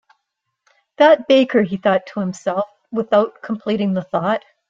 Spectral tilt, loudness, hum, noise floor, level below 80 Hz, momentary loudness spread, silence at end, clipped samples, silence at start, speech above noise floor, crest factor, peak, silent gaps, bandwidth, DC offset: -6.5 dB/octave; -18 LUFS; none; -76 dBFS; -64 dBFS; 11 LU; 0.3 s; under 0.1%; 1 s; 59 dB; 16 dB; -2 dBFS; none; 7.6 kHz; under 0.1%